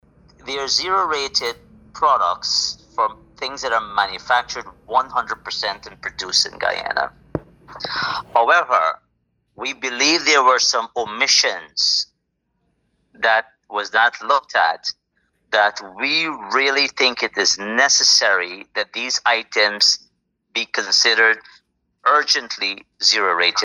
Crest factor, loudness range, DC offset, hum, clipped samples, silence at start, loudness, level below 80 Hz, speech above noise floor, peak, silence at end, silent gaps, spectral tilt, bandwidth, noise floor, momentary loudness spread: 18 dB; 5 LU; under 0.1%; none; under 0.1%; 0.45 s; -18 LUFS; -58 dBFS; 53 dB; -2 dBFS; 0 s; none; 0 dB/octave; 16 kHz; -72 dBFS; 13 LU